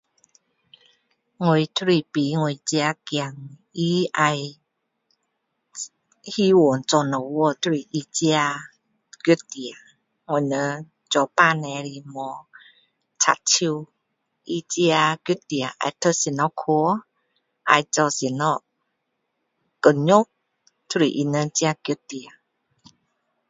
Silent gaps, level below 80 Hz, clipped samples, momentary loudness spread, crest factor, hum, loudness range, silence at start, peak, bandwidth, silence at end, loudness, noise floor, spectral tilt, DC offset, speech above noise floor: none; -70 dBFS; under 0.1%; 16 LU; 24 dB; none; 3 LU; 1.4 s; 0 dBFS; 7.8 kHz; 1.2 s; -22 LUFS; -76 dBFS; -4 dB/octave; under 0.1%; 55 dB